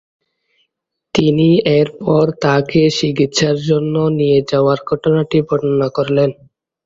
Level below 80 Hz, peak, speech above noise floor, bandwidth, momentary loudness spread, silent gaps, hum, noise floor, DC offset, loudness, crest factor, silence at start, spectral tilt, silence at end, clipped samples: -50 dBFS; 0 dBFS; 61 dB; 7.8 kHz; 4 LU; none; none; -74 dBFS; under 0.1%; -15 LUFS; 14 dB; 1.15 s; -6 dB/octave; 0.55 s; under 0.1%